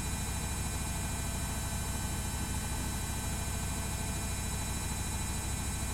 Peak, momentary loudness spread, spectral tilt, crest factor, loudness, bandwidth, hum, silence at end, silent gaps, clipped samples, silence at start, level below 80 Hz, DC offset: -22 dBFS; 0 LU; -3.5 dB/octave; 12 dB; -35 LUFS; 16.5 kHz; none; 0 s; none; under 0.1%; 0 s; -40 dBFS; under 0.1%